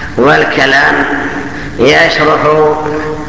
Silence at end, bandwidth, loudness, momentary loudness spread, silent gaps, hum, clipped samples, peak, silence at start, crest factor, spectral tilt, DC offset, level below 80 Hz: 0 s; 8 kHz; -8 LUFS; 10 LU; none; none; 0.8%; 0 dBFS; 0 s; 10 dB; -5 dB/octave; 3%; -34 dBFS